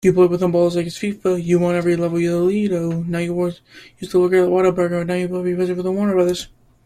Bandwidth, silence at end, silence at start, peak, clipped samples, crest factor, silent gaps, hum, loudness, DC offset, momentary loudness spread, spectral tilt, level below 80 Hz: 14 kHz; 0.4 s; 0.05 s; -4 dBFS; under 0.1%; 14 dB; none; none; -19 LUFS; under 0.1%; 8 LU; -7 dB/octave; -52 dBFS